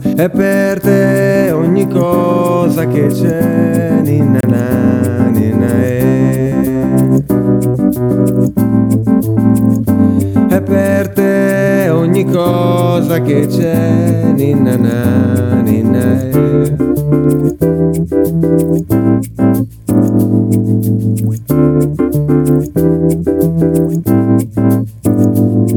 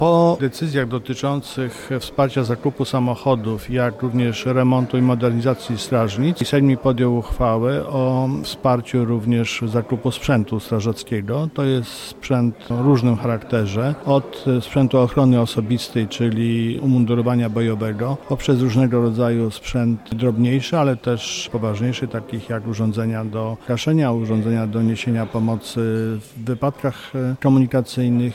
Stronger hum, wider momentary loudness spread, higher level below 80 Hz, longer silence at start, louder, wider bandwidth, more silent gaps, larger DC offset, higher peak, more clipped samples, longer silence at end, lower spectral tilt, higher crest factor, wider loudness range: neither; second, 2 LU vs 7 LU; first, -38 dBFS vs -44 dBFS; about the same, 0 s vs 0 s; first, -12 LUFS vs -20 LUFS; first, 18 kHz vs 15 kHz; neither; neither; first, 0 dBFS vs -6 dBFS; neither; about the same, 0 s vs 0 s; about the same, -8 dB/octave vs -7 dB/octave; about the same, 10 dB vs 14 dB; about the same, 1 LU vs 3 LU